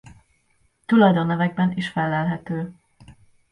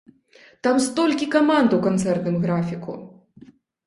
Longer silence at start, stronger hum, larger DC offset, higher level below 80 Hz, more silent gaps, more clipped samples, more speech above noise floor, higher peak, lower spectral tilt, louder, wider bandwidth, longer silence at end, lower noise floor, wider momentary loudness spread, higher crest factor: second, 0.05 s vs 0.65 s; neither; neither; about the same, -58 dBFS vs -58 dBFS; neither; neither; first, 44 dB vs 32 dB; about the same, -4 dBFS vs -6 dBFS; first, -8 dB/octave vs -6 dB/octave; about the same, -21 LUFS vs -21 LUFS; about the same, 10.5 kHz vs 11.5 kHz; second, 0.4 s vs 0.8 s; first, -64 dBFS vs -53 dBFS; about the same, 14 LU vs 13 LU; about the same, 20 dB vs 16 dB